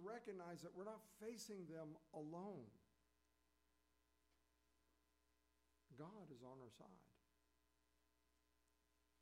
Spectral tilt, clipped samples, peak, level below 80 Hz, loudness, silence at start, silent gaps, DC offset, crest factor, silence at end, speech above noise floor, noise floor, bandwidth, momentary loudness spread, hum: -5.5 dB/octave; under 0.1%; -42 dBFS; -88 dBFS; -57 LUFS; 0 s; none; under 0.1%; 18 dB; 2.1 s; 28 dB; -85 dBFS; 15.5 kHz; 9 LU; 60 Hz at -90 dBFS